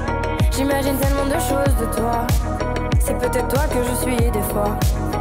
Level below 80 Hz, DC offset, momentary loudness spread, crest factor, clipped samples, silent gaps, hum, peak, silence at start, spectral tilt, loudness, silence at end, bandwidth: -24 dBFS; under 0.1%; 2 LU; 10 dB; under 0.1%; none; none; -10 dBFS; 0 s; -5.5 dB/octave; -20 LUFS; 0 s; 16.5 kHz